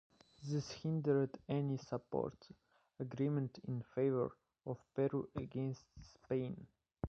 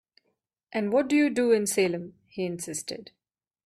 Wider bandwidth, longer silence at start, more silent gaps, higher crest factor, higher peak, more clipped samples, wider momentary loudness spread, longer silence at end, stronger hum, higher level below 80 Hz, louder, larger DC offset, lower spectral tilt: second, 7.6 kHz vs 14.5 kHz; second, 0.4 s vs 0.75 s; neither; about the same, 18 dB vs 16 dB; second, -22 dBFS vs -12 dBFS; neither; about the same, 13 LU vs 14 LU; second, 0 s vs 0.6 s; neither; about the same, -66 dBFS vs -70 dBFS; second, -41 LUFS vs -26 LUFS; neither; first, -8 dB/octave vs -4.5 dB/octave